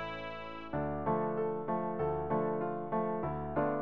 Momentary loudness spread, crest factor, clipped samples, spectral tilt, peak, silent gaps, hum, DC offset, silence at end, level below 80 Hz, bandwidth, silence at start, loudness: 7 LU; 16 dB; under 0.1%; -9.5 dB/octave; -20 dBFS; none; none; 0.3%; 0 s; -56 dBFS; 5.6 kHz; 0 s; -35 LUFS